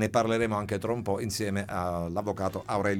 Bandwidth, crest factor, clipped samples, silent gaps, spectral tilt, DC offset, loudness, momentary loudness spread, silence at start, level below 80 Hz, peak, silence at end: 18 kHz; 18 dB; under 0.1%; none; -5.5 dB/octave; under 0.1%; -30 LUFS; 6 LU; 0 s; -54 dBFS; -10 dBFS; 0 s